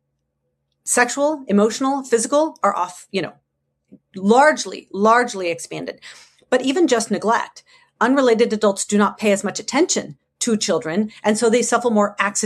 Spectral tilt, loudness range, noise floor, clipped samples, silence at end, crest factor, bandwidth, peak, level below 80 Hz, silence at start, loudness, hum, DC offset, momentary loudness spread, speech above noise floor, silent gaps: -3.5 dB/octave; 2 LU; -73 dBFS; under 0.1%; 0 s; 18 dB; 13 kHz; -2 dBFS; -68 dBFS; 0.85 s; -18 LUFS; none; under 0.1%; 11 LU; 55 dB; none